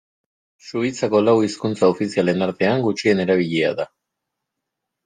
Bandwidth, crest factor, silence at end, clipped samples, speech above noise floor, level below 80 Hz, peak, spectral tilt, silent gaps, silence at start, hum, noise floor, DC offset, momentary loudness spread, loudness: 9.6 kHz; 16 dB; 1.2 s; under 0.1%; 62 dB; -64 dBFS; -4 dBFS; -6 dB/octave; none; 0.65 s; none; -81 dBFS; under 0.1%; 7 LU; -19 LUFS